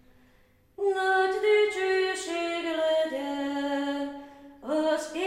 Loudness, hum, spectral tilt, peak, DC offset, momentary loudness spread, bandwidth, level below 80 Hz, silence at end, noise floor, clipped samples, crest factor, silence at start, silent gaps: -27 LUFS; none; -2 dB/octave; -14 dBFS; under 0.1%; 8 LU; 13 kHz; -66 dBFS; 0 s; -61 dBFS; under 0.1%; 14 dB; 0.8 s; none